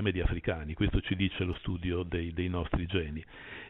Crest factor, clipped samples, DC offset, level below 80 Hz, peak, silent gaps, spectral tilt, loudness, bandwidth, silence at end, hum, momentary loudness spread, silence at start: 18 dB; under 0.1%; under 0.1%; -40 dBFS; -14 dBFS; none; -5.5 dB/octave; -33 LUFS; 4.1 kHz; 0 s; none; 4 LU; 0 s